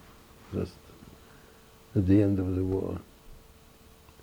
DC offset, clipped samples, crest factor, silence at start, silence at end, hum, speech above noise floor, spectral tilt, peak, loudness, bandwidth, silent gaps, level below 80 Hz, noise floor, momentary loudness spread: under 0.1%; under 0.1%; 20 dB; 0.5 s; 0.85 s; none; 29 dB; -9 dB/octave; -12 dBFS; -29 LUFS; 20 kHz; none; -52 dBFS; -55 dBFS; 27 LU